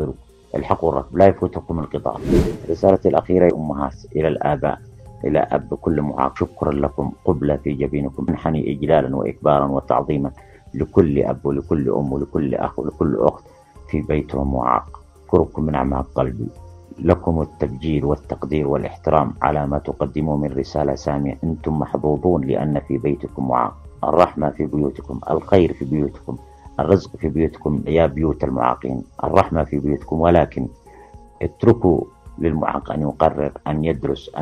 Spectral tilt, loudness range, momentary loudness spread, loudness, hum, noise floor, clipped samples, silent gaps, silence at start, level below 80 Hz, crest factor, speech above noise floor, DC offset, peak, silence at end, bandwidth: -9 dB/octave; 3 LU; 9 LU; -20 LUFS; none; -43 dBFS; under 0.1%; none; 0 s; -36 dBFS; 20 dB; 24 dB; under 0.1%; 0 dBFS; 0 s; 10.5 kHz